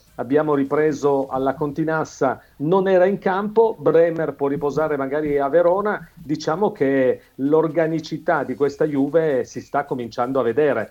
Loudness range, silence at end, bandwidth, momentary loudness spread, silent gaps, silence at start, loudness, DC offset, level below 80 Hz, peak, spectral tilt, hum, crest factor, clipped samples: 2 LU; 0.05 s; 15.5 kHz; 8 LU; none; 0.2 s; -20 LUFS; under 0.1%; -56 dBFS; -4 dBFS; -7 dB/octave; none; 14 dB; under 0.1%